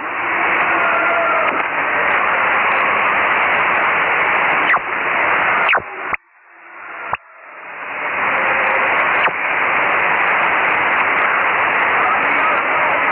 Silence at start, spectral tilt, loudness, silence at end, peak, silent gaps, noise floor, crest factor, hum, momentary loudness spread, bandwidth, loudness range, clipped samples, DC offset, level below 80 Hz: 0 s; 0 dB/octave; -15 LUFS; 0 s; -4 dBFS; none; -45 dBFS; 12 dB; none; 10 LU; 4.4 kHz; 5 LU; under 0.1%; under 0.1%; -56 dBFS